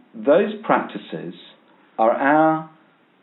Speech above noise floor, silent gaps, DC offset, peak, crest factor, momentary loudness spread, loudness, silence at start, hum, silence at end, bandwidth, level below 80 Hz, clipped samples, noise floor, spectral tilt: 36 dB; none; under 0.1%; -2 dBFS; 20 dB; 17 LU; -19 LUFS; 0.15 s; none; 0.55 s; 4.1 kHz; -84 dBFS; under 0.1%; -56 dBFS; -4.5 dB/octave